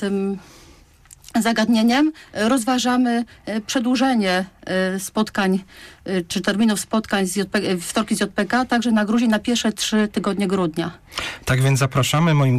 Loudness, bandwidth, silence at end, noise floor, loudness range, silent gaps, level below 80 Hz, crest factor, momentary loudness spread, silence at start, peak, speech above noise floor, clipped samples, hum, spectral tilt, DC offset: -20 LUFS; 15.5 kHz; 0 s; -49 dBFS; 2 LU; none; -50 dBFS; 12 dB; 8 LU; 0 s; -8 dBFS; 29 dB; under 0.1%; none; -5 dB/octave; under 0.1%